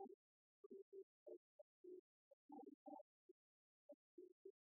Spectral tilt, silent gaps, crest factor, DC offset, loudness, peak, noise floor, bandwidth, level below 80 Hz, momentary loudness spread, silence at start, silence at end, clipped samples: 5.5 dB/octave; 0.14-0.70 s, 0.82-0.92 s, 1.03-1.26 s, 1.37-1.84 s, 1.99-2.49 s, 2.74-2.86 s, 3.01-4.18 s, 4.32-4.45 s; 18 dB; under 0.1%; -64 LUFS; -46 dBFS; under -90 dBFS; 1 kHz; under -90 dBFS; 6 LU; 0 s; 0.25 s; under 0.1%